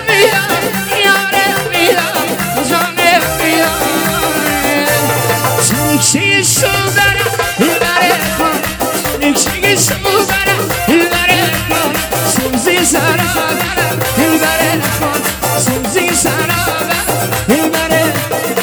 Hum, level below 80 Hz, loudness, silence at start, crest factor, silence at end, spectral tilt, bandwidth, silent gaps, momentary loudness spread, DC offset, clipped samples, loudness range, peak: none; -34 dBFS; -11 LUFS; 0 s; 12 dB; 0 s; -3 dB/octave; over 20 kHz; none; 4 LU; under 0.1%; under 0.1%; 2 LU; 0 dBFS